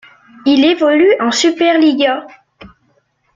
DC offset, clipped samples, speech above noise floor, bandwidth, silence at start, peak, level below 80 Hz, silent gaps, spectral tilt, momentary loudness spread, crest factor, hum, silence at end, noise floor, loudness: under 0.1%; under 0.1%; 47 dB; 9.4 kHz; 0.45 s; -2 dBFS; -56 dBFS; none; -2.5 dB/octave; 5 LU; 12 dB; none; 1.1 s; -59 dBFS; -12 LUFS